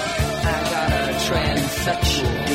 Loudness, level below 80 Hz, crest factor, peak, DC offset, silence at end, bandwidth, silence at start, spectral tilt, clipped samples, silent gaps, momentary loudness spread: -21 LUFS; -30 dBFS; 14 dB; -6 dBFS; under 0.1%; 0 s; 16.5 kHz; 0 s; -4 dB/octave; under 0.1%; none; 2 LU